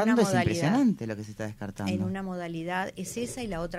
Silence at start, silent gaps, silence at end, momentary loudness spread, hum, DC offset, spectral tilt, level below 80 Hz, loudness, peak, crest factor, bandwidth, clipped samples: 0 s; none; 0 s; 12 LU; none; under 0.1%; -6 dB/octave; -52 dBFS; -29 LUFS; -12 dBFS; 16 dB; 15 kHz; under 0.1%